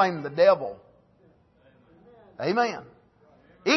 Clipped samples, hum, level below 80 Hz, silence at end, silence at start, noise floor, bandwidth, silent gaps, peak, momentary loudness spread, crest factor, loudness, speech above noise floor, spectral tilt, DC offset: under 0.1%; none; -70 dBFS; 0 s; 0 s; -60 dBFS; 6.2 kHz; none; -8 dBFS; 18 LU; 20 dB; -25 LUFS; 37 dB; -4.5 dB/octave; under 0.1%